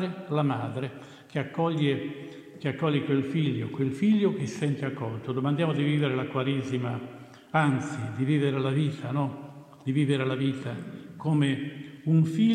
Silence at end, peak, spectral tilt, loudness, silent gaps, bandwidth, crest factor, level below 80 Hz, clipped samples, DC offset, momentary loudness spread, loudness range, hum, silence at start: 0 s; -10 dBFS; -7.5 dB/octave; -28 LUFS; none; 10 kHz; 16 dB; -74 dBFS; under 0.1%; under 0.1%; 12 LU; 2 LU; none; 0 s